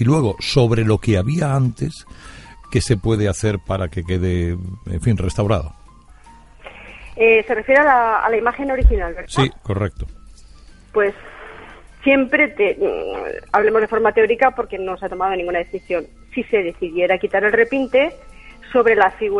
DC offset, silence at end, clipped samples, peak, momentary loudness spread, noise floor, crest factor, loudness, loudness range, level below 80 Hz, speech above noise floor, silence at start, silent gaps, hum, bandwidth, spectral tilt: under 0.1%; 0 s; under 0.1%; -2 dBFS; 13 LU; -44 dBFS; 18 dB; -18 LUFS; 5 LU; -30 dBFS; 27 dB; 0 s; none; none; 11.5 kHz; -6.5 dB/octave